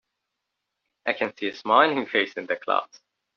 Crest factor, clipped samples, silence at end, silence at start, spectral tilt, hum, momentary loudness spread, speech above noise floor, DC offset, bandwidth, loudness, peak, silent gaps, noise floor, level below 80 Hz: 24 dB; under 0.1%; 0.5 s; 1.05 s; -0.5 dB/octave; none; 11 LU; 58 dB; under 0.1%; 6.8 kHz; -24 LUFS; -2 dBFS; none; -82 dBFS; -76 dBFS